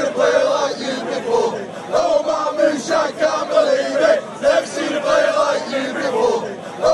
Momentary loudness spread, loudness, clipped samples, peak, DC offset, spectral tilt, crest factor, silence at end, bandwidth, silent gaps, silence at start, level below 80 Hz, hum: 6 LU; -18 LUFS; under 0.1%; -2 dBFS; under 0.1%; -3.5 dB/octave; 14 dB; 0 s; 11.5 kHz; none; 0 s; -56 dBFS; none